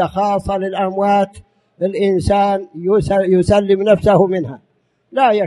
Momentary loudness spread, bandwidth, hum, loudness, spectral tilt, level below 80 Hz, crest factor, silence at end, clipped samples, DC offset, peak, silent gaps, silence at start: 9 LU; 11.5 kHz; none; -15 LUFS; -7 dB/octave; -38 dBFS; 16 dB; 0 s; under 0.1%; under 0.1%; 0 dBFS; none; 0 s